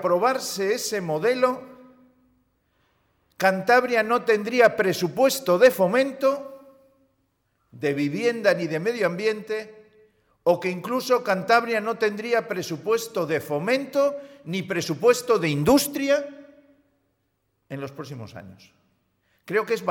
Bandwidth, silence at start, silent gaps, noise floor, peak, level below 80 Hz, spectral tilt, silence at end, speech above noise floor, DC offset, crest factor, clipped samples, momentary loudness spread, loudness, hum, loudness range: 18 kHz; 0 s; none; -73 dBFS; -6 dBFS; -62 dBFS; -4.5 dB/octave; 0 s; 50 dB; under 0.1%; 18 dB; under 0.1%; 14 LU; -23 LUFS; none; 6 LU